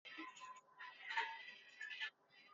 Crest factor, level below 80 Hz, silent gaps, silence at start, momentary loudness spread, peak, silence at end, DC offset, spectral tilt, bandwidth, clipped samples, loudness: 24 dB; under -90 dBFS; none; 0.05 s; 13 LU; -28 dBFS; 0 s; under 0.1%; 3.5 dB/octave; 7.4 kHz; under 0.1%; -49 LUFS